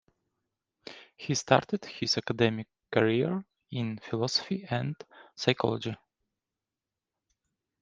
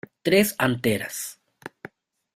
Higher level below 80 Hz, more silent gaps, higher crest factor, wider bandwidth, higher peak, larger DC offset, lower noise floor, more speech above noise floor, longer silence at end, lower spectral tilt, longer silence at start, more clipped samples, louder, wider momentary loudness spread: second, -68 dBFS vs -60 dBFS; neither; first, 28 dB vs 22 dB; second, 9.8 kHz vs 16 kHz; about the same, -4 dBFS vs -4 dBFS; neither; first, -90 dBFS vs -49 dBFS; first, 61 dB vs 27 dB; first, 1.85 s vs 0.65 s; about the same, -5 dB/octave vs -4.5 dB/octave; first, 0.85 s vs 0.25 s; neither; second, -30 LUFS vs -23 LUFS; second, 19 LU vs 22 LU